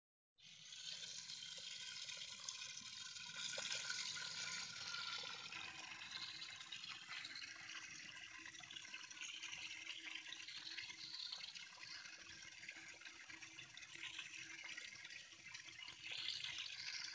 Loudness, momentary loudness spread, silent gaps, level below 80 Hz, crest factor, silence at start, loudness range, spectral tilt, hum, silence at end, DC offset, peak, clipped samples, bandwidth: -49 LUFS; 9 LU; none; -88 dBFS; 24 dB; 0.4 s; 6 LU; 1 dB/octave; none; 0 s; under 0.1%; -28 dBFS; under 0.1%; 8 kHz